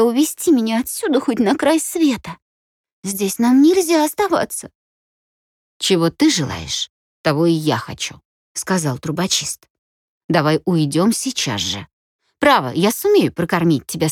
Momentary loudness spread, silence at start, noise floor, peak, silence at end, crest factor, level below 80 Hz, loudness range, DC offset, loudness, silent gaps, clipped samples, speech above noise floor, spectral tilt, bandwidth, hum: 12 LU; 0 s; under -90 dBFS; -2 dBFS; 0 s; 16 dB; -56 dBFS; 3 LU; under 0.1%; -18 LUFS; 2.42-2.84 s, 2.92-3.03 s, 4.75-5.80 s, 6.89-7.24 s, 8.25-8.55 s, 9.70-10.29 s, 11.93-12.19 s; under 0.1%; over 73 dB; -4.5 dB/octave; 17.5 kHz; none